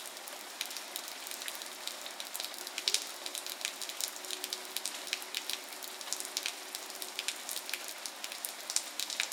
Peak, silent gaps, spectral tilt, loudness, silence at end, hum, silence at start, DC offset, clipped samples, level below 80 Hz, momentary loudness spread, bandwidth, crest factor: -4 dBFS; none; 2.5 dB/octave; -37 LUFS; 0 s; none; 0 s; under 0.1%; under 0.1%; under -90 dBFS; 6 LU; 18 kHz; 36 dB